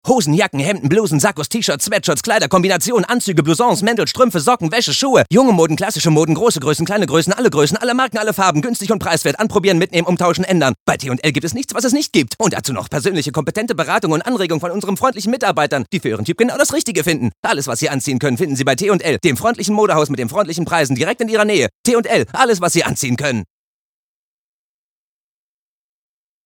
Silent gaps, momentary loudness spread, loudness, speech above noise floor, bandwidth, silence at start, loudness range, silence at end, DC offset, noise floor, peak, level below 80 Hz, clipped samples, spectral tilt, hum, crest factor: 10.80-10.86 s, 17.37-17.43 s, 21.75-21.84 s; 5 LU; -16 LUFS; over 75 dB; 19.5 kHz; 0.05 s; 4 LU; 3.05 s; under 0.1%; under -90 dBFS; 0 dBFS; -54 dBFS; under 0.1%; -4.5 dB/octave; none; 16 dB